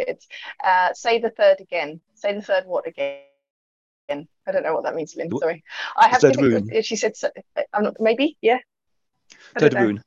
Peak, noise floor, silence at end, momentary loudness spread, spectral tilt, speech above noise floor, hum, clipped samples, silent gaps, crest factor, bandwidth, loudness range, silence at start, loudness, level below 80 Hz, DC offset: 0 dBFS; -77 dBFS; 0.05 s; 14 LU; -5 dB/octave; 56 dB; none; under 0.1%; 3.50-4.08 s; 22 dB; 8 kHz; 7 LU; 0 s; -21 LUFS; -66 dBFS; under 0.1%